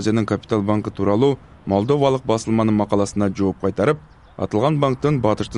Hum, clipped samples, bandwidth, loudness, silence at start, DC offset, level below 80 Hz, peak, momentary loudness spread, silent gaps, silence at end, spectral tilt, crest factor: none; under 0.1%; 11 kHz; -20 LUFS; 0 s; 0.1%; -48 dBFS; -2 dBFS; 4 LU; none; 0 s; -7 dB/octave; 16 dB